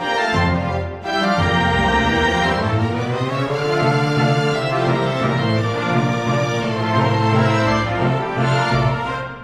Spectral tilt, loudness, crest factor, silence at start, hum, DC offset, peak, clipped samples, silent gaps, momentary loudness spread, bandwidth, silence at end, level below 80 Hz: -6 dB/octave; -18 LUFS; 14 dB; 0 s; none; under 0.1%; -4 dBFS; under 0.1%; none; 5 LU; 11.5 kHz; 0 s; -38 dBFS